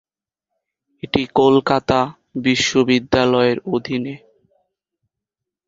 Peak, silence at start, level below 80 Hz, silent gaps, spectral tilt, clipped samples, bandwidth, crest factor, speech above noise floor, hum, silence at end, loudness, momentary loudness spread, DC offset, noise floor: -2 dBFS; 1.05 s; -50 dBFS; none; -5 dB/octave; under 0.1%; 7.8 kHz; 18 dB; 67 dB; none; 1.5 s; -17 LUFS; 10 LU; under 0.1%; -84 dBFS